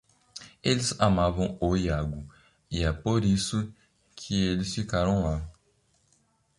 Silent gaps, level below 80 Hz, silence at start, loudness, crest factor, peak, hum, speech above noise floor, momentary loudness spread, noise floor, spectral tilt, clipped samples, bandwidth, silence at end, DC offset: none; -40 dBFS; 0.35 s; -27 LUFS; 22 dB; -8 dBFS; none; 42 dB; 19 LU; -68 dBFS; -5.5 dB/octave; under 0.1%; 11.5 kHz; 1.05 s; under 0.1%